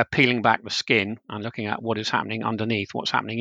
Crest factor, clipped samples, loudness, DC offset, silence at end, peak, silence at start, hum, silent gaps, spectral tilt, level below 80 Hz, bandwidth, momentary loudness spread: 22 dB; under 0.1%; -24 LUFS; under 0.1%; 0 s; -2 dBFS; 0 s; none; none; -4.5 dB/octave; -62 dBFS; 9.2 kHz; 11 LU